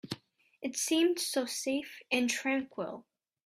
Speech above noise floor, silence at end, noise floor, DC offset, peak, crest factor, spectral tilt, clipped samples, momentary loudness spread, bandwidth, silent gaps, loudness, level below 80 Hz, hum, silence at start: 27 dB; 0.45 s; -60 dBFS; under 0.1%; -16 dBFS; 18 dB; -2 dB/octave; under 0.1%; 14 LU; 15.5 kHz; none; -32 LUFS; -78 dBFS; none; 0.05 s